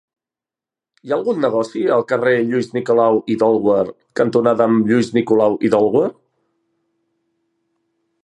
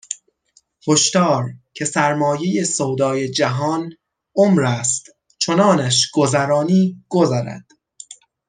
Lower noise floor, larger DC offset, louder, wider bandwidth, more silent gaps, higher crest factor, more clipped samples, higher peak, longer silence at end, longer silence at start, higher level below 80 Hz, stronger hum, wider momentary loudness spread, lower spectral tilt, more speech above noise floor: first, -89 dBFS vs -59 dBFS; neither; about the same, -16 LUFS vs -17 LUFS; about the same, 10.5 kHz vs 10 kHz; neither; about the same, 16 dB vs 16 dB; neither; about the same, -2 dBFS vs -2 dBFS; first, 2.1 s vs 0.35 s; first, 1.05 s vs 0.1 s; about the same, -62 dBFS vs -62 dBFS; neither; second, 6 LU vs 15 LU; first, -7 dB/octave vs -4.5 dB/octave; first, 73 dB vs 42 dB